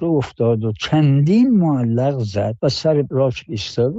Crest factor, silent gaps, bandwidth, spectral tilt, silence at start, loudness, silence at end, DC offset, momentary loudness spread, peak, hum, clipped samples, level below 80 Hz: 12 dB; none; 7.8 kHz; -7.5 dB/octave; 0 s; -18 LUFS; 0 s; under 0.1%; 7 LU; -6 dBFS; none; under 0.1%; -50 dBFS